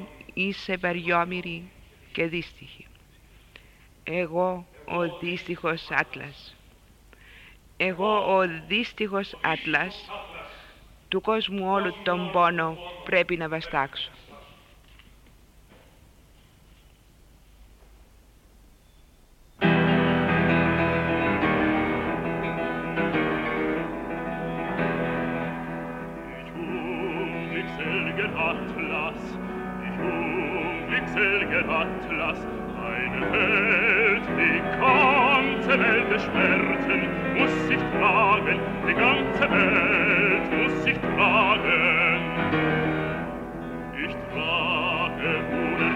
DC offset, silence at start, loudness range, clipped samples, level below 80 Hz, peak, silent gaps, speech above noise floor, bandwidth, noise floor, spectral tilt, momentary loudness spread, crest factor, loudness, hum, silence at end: under 0.1%; 0 s; 10 LU; under 0.1%; -48 dBFS; -6 dBFS; none; 28 dB; 15.5 kHz; -55 dBFS; -6.5 dB/octave; 13 LU; 20 dB; -24 LUFS; none; 0 s